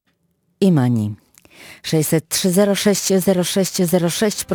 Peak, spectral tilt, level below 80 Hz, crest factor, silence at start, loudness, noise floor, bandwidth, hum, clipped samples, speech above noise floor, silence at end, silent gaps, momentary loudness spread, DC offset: -4 dBFS; -5 dB/octave; -56 dBFS; 14 dB; 0.6 s; -17 LUFS; -66 dBFS; 19 kHz; none; under 0.1%; 49 dB; 0 s; none; 6 LU; under 0.1%